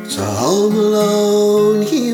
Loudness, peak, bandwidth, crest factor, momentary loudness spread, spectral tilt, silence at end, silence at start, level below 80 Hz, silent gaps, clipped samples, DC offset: -14 LUFS; -2 dBFS; 17.5 kHz; 12 dB; 4 LU; -5 dB/octave; 0 s; 0 s; -60 dBFS; none; under 0.1%; under 0.1%